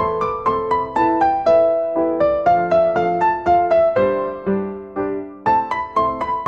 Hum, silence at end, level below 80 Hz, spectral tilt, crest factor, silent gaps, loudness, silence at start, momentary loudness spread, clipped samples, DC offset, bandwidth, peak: none; 0 s; -48 dBFS; -7.5 dB/octave; 12 dB; none; -18 LUFS; 0 s; 8 LU; under 0.1%; 0.2%; 7.4 kHz; -4 dBFS